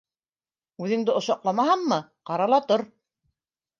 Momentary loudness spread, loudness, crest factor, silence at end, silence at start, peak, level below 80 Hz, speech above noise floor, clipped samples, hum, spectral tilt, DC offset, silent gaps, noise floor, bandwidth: 9 LU; -24 LUFS; 18 dB; 0.95 s; 0.8 s; -8 dBFS; -78 dBFS; over 67 dB; under 0.1%; none; -5.5 dB/octave; under 0.1%; none; under -90 dBFS; 7.4 kHz